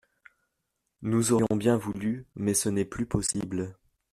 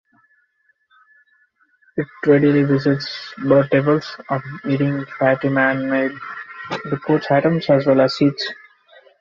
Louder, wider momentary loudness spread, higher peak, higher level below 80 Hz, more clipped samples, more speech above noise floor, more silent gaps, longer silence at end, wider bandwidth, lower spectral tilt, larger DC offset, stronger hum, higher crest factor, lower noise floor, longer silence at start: second, -28 LUFS vs -18 LUFS; second, 10 LU vs 13 LU; second, -10 dBFS vs -2 dBFS; first, -54 dBFS vs -60 dBFS; neither; first, 53 dB vs 46 dB; neither; second, 0.4 s vs 0.65 s; first, 13.5 kHz vs 7.2 kHz; second, -5 dB/octave vs -7.5 dB/octave; neither; neither; about the same, 18 dB vs 18 dB; first, -81 dBFS vs -64 dBFS; second, 1 s vs 1.95 s